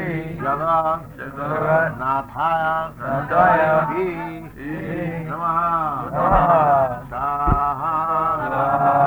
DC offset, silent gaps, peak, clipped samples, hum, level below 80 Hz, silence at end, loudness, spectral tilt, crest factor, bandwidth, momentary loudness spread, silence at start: under 0.1%; none; -2 dBFS; under 0.1%; none; -38 dBFS; 0 s; -20 LUFS; -8.5 dB/octave; 18 dB; over 20 kHz; 12 LU; 0 s